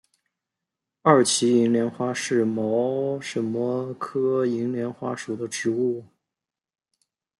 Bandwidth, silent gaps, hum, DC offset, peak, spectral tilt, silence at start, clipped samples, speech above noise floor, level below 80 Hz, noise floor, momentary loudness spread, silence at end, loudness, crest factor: 12 kHz; none; none; under 0.1%; -4 dBFS; -4.5 dB/octave; 1.05 s; under 0.1%; 65 dB; -72 dBFS; -88 dBFS; 11 LU; 1.35 s; -24 LUFS; 20 dB